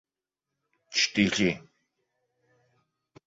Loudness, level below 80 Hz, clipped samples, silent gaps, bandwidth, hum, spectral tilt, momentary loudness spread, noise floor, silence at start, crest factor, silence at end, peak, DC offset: -26 LUFS; -62 dBFS; under 0.1%; none; 8 kHz; none; -3.5 dB/octave; 8 LU; -88 dBFS; 0.9 s; 24 dB; 1.7 s; -8 dBFS; under 0.1%